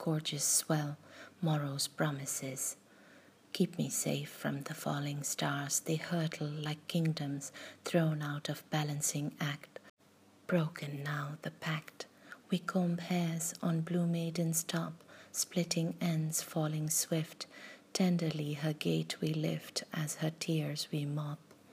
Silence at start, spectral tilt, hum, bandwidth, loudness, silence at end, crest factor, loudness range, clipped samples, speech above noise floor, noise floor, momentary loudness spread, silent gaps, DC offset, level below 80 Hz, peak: 0 s; -4.5 dB/octave; none; 15.5 kHz; -35 LUFS; 0 s; 20 dB; 3 LU; under 0.1%; 29 dB; -64 dBFS; 11 LU; 9.90-9.97 s; under 0.1%; -84 dBFS; -16 dBFS